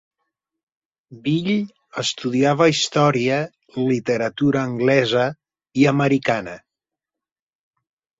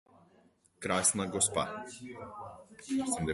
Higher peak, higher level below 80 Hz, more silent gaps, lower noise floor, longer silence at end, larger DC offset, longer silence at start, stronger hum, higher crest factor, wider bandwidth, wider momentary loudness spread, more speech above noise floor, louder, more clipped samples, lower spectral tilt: first, -2 dBFS vs -14 dBFS; about the same, -60 dBFS vs -60 dBFS; neither; first, -88 dBFS vs -66 dBFS; first, 1.6 s vs 0 s; neither; first, 1.1 s vs 0.8 s; neither; about the same, 18 dB vs 22 dB; second, 7.8 kHz vs 12 kHz; second, 9 LU vs 19 LU; first, 69 dB vs 32 dB; first, -20 LUFS vs -31 LUFS; neither; first, -5.5 dB/octave vs -3 dB/octave